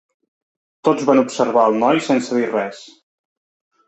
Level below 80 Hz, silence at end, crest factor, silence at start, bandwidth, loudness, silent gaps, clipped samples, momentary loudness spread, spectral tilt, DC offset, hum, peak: -66 dBFS; 1 s; 18 dB; 0.85 s; 8.4 kHz; -17 LUFS; none; under 0.1%; 7 LU; -5 dB/octave; under 0.1%; none; -2 dBFS